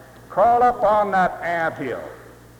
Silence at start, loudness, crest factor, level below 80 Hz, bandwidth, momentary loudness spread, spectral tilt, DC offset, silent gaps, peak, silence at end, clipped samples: 0 s; -20 LUFS; 14 dB; -50 dBFS; 17.5 kHz; 13 LU; -6 dB/octave; under 0.1%; none; -6 dBFS; 0.3 s; under 0.1%